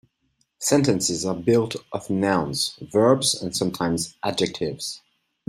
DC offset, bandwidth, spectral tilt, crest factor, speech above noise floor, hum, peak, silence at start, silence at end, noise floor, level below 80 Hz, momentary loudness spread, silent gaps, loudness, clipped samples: under 0.1%; 16 kHz; -4 dB/octave; 20 dB; 47 dB; none; -4 dBFS; 0.6 s; 0.5 s; -70 dBFS; -58 dBFS; 9 LU; none; -23 LUFS; under 0.1%